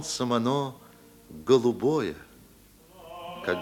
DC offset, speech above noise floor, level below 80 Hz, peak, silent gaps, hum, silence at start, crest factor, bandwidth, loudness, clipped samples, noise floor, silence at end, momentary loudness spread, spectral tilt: under 0.1%; 29 dB; -62 dBFS; -8 dBFS; none; none; 0 s; 20 dB; 18 kHz; -27 LUFS; under 0.1%; -55 dBFS; 0 s; 22 LU; -5 dB/octave